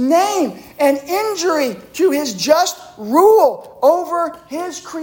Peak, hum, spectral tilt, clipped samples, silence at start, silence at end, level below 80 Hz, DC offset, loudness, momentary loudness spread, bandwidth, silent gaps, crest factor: -2 dBFS; none; -3 dB/octave; under 0.1%; 0 s; 0 s; -60 dBFS; under 0.1%; -16 LUFS; 12 LU; 17 kHz; none; 14 dB